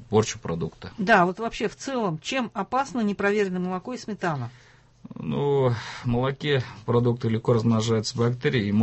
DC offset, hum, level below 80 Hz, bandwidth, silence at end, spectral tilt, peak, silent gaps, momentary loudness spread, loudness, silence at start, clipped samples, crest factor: under 0.1%; none; -52 dBFS; 8.4 kHz; 0 s; -6 dB/octave; -6 dBFS; none; 9 LU; -25 LUFS; 0 s; under 0.1%; 18 dB